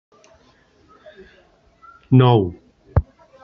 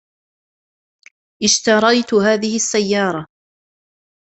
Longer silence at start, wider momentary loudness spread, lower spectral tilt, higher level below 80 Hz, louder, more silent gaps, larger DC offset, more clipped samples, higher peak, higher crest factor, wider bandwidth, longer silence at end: first, 2.1 s vs 1.4 s; first, 10 LU vs 7 LU; first, -7.5 dB/octave vs -3 dB/octave; first, -36 dBFS vs -60 dBFS; second, -18 LUFS vs -15 LUFS; neither; neither; neither; about the same, -2 dBFS vs -2 dBFS; about the same, 20 dB vs 18 dB; second, 5 kHz vs 8.4 kHz; second, 0.4 s vs 0.95 s